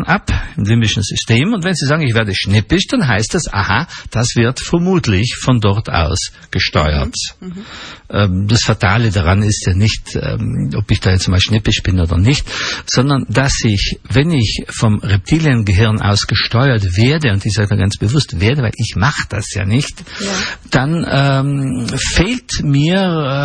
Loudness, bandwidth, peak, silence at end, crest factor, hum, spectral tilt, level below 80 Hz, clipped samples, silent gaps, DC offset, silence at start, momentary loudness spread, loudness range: -14 LUFS; 10 kHz; 0 dBFS; 0 s; 14 dB; none; -5 dB/octave; -28 dBFS; under 0.1%; none; under 0.1%; 0 s; 6 LU; 3 LU